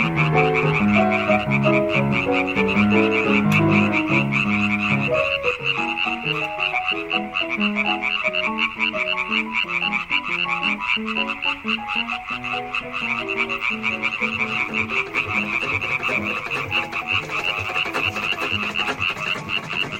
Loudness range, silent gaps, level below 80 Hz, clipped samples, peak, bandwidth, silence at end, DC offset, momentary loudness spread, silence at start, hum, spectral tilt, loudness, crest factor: 4 LU; none; -48 dBFS; under 0.1%; -4 dBFS; 16 kHz; 0 s; under 0.1%; 6 LU; 0 s; none; -5.5 dB/octave; -20 LUFS; 18 dB